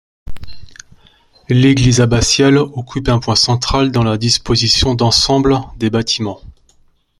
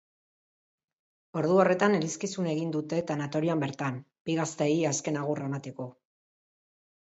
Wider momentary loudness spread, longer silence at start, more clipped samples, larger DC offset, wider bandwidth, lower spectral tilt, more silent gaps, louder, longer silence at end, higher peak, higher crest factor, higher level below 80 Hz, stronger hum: second, 7 LU vs 13 LU; second, 0.25 s vs 1.35 s; neither; neither; first, 12.5 kHz vs 8.2 kHz; about the same, -4.5 dB/octave vs -5.5 dB/octave; second, none vs 4.20-4.25 s; first, -13 LUFS vs -29 LUFS; second, 0.7 s vs 1.3 s; first, 0 dBFS vs -10 dBFS; second, 14 dB vs 20 dB; first, -30 dBFS vs -74 dBFS; neither